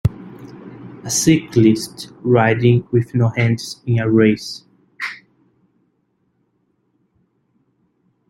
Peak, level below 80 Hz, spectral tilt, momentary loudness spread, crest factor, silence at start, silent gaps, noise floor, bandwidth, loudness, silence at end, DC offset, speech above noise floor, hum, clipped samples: -2 dBFS; -48 dBFS; -5.5 dB/octave; 23 LU; 18 dB; 0.05 s; none; -66 dBFS; 15 kHz; -17 LUFS; 3.15 s; under 0.1%; 50 dB; none; under 0.1%